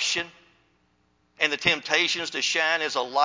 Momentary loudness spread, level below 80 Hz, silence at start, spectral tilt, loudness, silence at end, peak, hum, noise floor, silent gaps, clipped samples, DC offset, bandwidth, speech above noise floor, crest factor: 5 LU; -64 dBFS; 0 s; -1 dB/octave; -23 LUFS; 0 s; -4 dBFS; none; -67 dBFS; none; under 0.1%; under 0.1%; 7.8 kHz; 43 dB; 24 dB